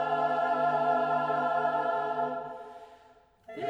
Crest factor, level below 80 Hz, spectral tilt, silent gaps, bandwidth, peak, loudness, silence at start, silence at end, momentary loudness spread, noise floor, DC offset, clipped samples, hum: 14 dB; -74 dBFS; -6.5 dB/octave; none; 7.4 kHz; -16 dBFS; -29 LUFS; 0 s; 0 s; 16 LU; -60 dBFS; under 0.1%; under 0.1%; none